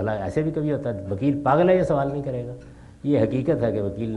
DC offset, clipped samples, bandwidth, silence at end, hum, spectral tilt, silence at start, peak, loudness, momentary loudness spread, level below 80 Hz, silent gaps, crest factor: under 0.1%; under 0.1%; 10.5 kHz; 0 s; none; -9 dB/octave; 0 s; -6 dBFS; -23 LUFS; 12 LU; -48 dBFS; none; 18 dB